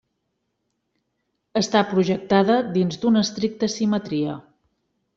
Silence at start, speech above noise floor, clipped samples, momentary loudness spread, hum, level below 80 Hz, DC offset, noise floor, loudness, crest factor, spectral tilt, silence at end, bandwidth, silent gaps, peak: 1.55 s; 55 dB; under 0.1%; 7 LU; none; -62 dBFS; under 0.1%; -75 dBFS; -21 LUFS; 18 dB; -5.5 dB/octave; 0.75 s; 7.6 kHz; none; -4 dBFS